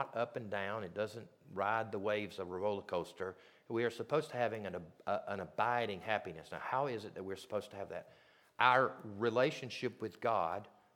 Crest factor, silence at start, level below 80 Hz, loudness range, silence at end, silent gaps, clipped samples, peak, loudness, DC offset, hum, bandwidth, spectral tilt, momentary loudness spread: 26 dB; 0 s; -78 dBFS; 4 LU; 0.25 s; none; under 0.1%; -12 dBFS; -38 LUFS; under 0.1%; none; 16 kHz; -5.5 dB/octave; 12 LU